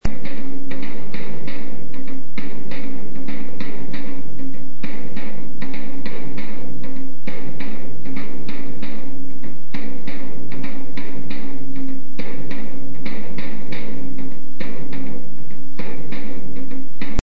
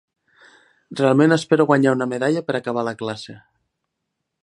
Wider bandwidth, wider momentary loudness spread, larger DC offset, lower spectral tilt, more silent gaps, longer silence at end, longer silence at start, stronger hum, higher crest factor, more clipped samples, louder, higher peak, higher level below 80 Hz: second, 8 kHz vs 11 kHz; second, 3 LU vs 15 LU; first, 50% vs under 0.1%; about the same, -7.5 dB/octave vs -6.5 dB/octave; neither; second, 0 s vs 1.1 s; second, 0 s vs 0.9 s; neither; about the same, 24 dB vs 20 dB; neither; second, -33 LUFS vs -19 LUFS; about the same, -4 dBFS vs -2 dBFS; first, -40 dBFS vs -68 dBFS